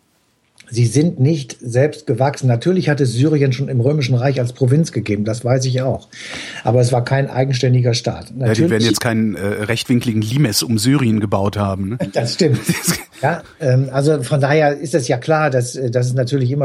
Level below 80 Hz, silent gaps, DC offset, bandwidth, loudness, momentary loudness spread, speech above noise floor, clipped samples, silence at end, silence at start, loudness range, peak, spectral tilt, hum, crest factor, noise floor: -52 dBFS; none; under 0.1%; 16 kHz; -17 LUFS; 6 LU; 44 dB; under 0.1%; 0 s; 0.7 s; 1 LU; -2 dBFS; -6 dB/octave; none; 14 dB; -60 dBFS